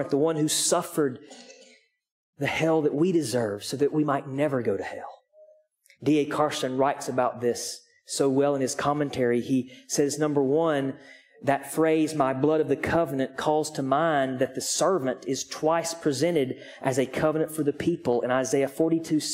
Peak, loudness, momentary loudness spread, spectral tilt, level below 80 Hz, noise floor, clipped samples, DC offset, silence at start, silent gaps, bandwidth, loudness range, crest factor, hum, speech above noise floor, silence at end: -8 dBFS; -26 LUFS; 7 LU; -4.5 dB/octave; -62 dBFS; -60 dBFS; under 0.1%; under 0.1%; 0 s; 2.12-2.33 s; 16 kHz; 3 LU; 18 dB; none; 35 dB; 0 s